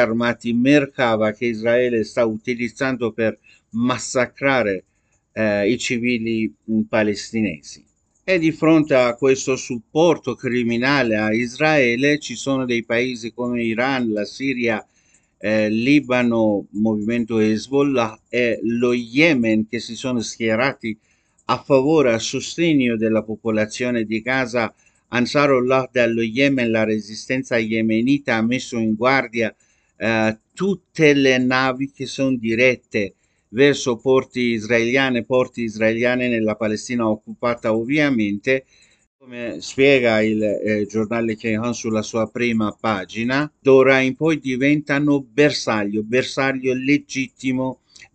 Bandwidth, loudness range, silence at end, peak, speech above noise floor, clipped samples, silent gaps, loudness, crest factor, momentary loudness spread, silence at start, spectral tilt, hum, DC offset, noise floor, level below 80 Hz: 9 kHz; 3 LU; 0.1 s; 0 dBFS; 37 dB; under 0.1%; 39.07-39.19 s; -19 LUFS; 20 dB; 8 LU; 0 s; -5 dB/octave; none; under 0.1%; -56 dBFS; -54 dBFS